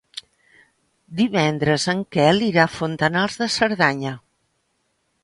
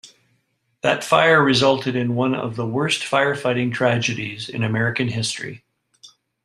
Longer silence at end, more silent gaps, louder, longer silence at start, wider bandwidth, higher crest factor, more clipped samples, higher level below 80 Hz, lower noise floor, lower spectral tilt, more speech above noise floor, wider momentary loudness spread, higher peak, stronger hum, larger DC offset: first, 1.05 s vs 0.4 s; neither; about the same, -20 LUFS vs -20 LUFS; about the same, 0.15 s vs 0.05 s; second, 11.5 kHz vs 13 kHz; about the same, 20 dB vs 20 dB; neither; about the same, -56 dBFS vs -60 dBFS; about the same, -70 dBFS vs -68 dBFS; about the same, -5 dB/octave vs -5 dB/octave; about the same, 50 dB vs 48 dB; first, 15 LU vs 11 LU; about the same, -2 dBFS vs -2 dBFS; neither; neither